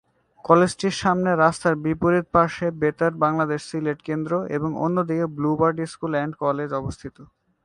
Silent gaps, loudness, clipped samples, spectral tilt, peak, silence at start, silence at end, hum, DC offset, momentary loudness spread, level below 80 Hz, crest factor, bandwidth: none; -22 LUFS; under 0.1%; -6.5 dB/octave; 0 dBFS; 0.45 s; 0.4 s; none; under 0.1%; 9 LU; -52 dBFS; 22 dB; 11 kHz